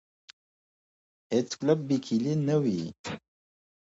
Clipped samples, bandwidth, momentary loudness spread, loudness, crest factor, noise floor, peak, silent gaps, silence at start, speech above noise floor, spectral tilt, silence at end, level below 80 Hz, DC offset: under 0.1%; 8 kHz; 13 LU; -28 LUFS; 20 dB; under -90 dBFS; -10 dBFS; 2.99-3.04 s; 1.3 s; over 63 dB; -6.5 dB/octave; 0.8 s; -68 dBFS; under 0.1%